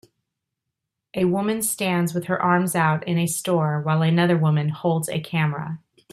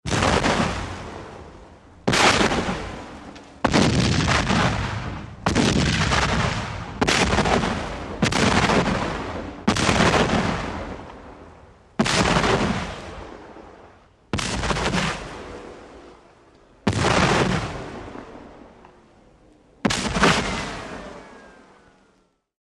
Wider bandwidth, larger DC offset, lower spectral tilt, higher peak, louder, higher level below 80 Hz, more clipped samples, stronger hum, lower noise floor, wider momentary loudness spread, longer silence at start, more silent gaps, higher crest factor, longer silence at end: first, 14.5 kHz vs 13 kHz; neither; about the same, -5.5 dB/octave vs -4.5 dB/octave; second, -6 dBFS vs -2 dBFS; about the same, -22 LUFS vs -21 LUFS; second, -64 dBFS vs -36 dBFS; neither; neither; first, -82 dBFS vs -63 dBFS; second, 6 LU vs 20 LU; first, 1.15 s vs 0.05 s; neither; second, 16 dB vs 22 dB; second, 0.35 s vs 1.1 s